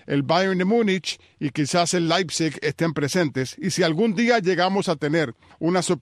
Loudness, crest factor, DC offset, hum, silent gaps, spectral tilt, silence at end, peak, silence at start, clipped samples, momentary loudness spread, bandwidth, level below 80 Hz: -22 LUFS; 16 dB; under 0.1%; none; none; -4.5 dB/octave; 0.05 s; -6 dBFS; 0.1 s; under 0.1%; 7 LU; 13.5 kHz; -64 dBFS